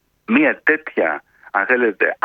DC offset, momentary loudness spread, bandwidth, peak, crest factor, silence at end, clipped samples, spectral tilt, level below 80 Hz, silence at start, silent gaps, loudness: under 0.1%; 7 LU; 4.7 kHz; 0 dBFS; 18 dB; 0.1 s; under 0.1%; -7.5 dB/octave; -66 dBFS; 0.3 s; none; -18 LUFS